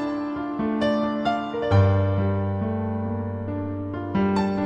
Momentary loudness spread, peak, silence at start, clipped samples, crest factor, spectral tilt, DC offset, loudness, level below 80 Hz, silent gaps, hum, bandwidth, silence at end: 9 LU; -8 dBFS; 0 s; under 0.1%; 16 dB; -8.5 dB/octave; under 0.1%; -24 LUFS; -50 dBFS; none; none; 7.8 kHz; 0 s